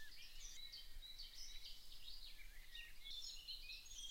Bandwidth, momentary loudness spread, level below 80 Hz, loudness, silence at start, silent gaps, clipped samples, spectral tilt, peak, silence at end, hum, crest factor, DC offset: 16 kHz; 7 LU; -60 dBFS; -54 LUFS; 0 s; none; under 0.1%; 0.5 dB/octave; -38 dBFS; 0 s; none; 14 dB; under 0.1%